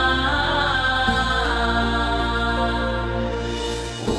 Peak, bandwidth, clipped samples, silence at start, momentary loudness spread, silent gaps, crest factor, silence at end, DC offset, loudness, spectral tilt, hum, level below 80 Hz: -6 dBFS; 11 kHz; under 0.1%; 0 s; 7 LU; none; 14 dB; 0 s; under 0.1%; -21 LUFS; -4.5 dB/octave; none; -30 dBFS